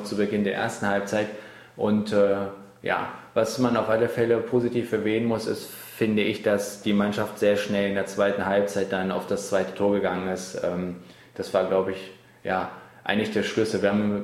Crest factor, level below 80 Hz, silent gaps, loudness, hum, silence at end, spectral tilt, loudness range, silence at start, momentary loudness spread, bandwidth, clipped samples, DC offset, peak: 18 dB; -62 dBFS; none; -25 LUFS; none; 0 s; -5.5 dB/octave; 3 LU; 0 s; 11 LU; 14.5 kHz; under 0.1%; under 0.1%; -6 dBFS